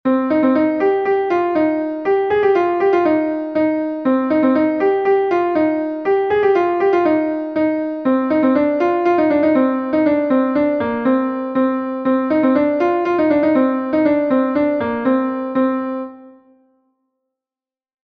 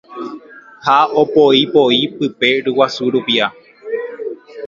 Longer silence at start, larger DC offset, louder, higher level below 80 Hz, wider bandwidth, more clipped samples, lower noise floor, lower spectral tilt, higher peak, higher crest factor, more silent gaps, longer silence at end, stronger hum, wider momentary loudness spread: about the same, 0.05 s vs 0.1 s; neither; second, -17 LUFS vs -14 LUFS; first, -56 dBFS vs -62 dBFS; second, 6.2 kHz vs 7.4 kHz; neither; first, under -90 dBFS vs -36 dBFS; first, -8 dB/octave vs -5 dB/octave; second, -4 dBFS vs 0 dBFS; about the same, 12 dB vs 16 dB; neither; first, 1.75 s vs 0 s; neither; second, 4 LU vs 17 LU